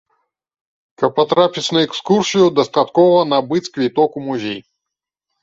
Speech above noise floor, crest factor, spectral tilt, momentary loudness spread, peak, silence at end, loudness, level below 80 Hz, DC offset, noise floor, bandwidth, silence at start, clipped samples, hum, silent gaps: 68 dB; 16 dB; -5 dB/octave; 10 LU; -2 dBFS; 0.8 s; -16 LUFS; -60 dBFS; under 0.1%; -83 dBFS; 8 kHz; 1 s; under 0.1%; none; none